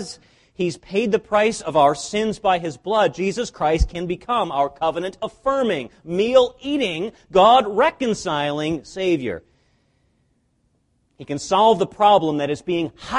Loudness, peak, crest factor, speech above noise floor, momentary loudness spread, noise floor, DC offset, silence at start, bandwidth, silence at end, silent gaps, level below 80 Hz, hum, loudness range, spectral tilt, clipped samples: -20 LUFS; -2 dBFS; 18 dB; 46 dB; 11 LU; -65 dBFS; under 0.1%; 0 s; 11.5 kHz; 0 s; none; -38 dBFS; none; 5 LU; -5 dB/octave; under 0.1%